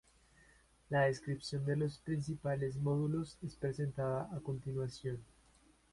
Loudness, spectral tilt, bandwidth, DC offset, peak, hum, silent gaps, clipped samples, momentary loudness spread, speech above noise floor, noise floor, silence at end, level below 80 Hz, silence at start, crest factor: -38 LUFS; -7 dB/octave; 11.5 kHz; under 0.1%; -20 dBFS; none; none; under 0.1%; 8 LU; 31 dB; -68 dBFS; 0.7 s; -64 dBFS; 0.9 s; 20 dB